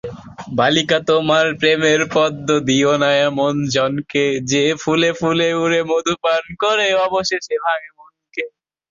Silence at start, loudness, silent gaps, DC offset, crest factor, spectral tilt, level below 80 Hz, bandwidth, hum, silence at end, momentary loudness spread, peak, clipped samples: 0.05 s; -17 LUFS; none; under 0.1%; 16 dB; -4 dB/octave; -54 dBFS; 7.6 kHz; none; 0.4 s; 9 LU; -2 dBFS; under 0.1%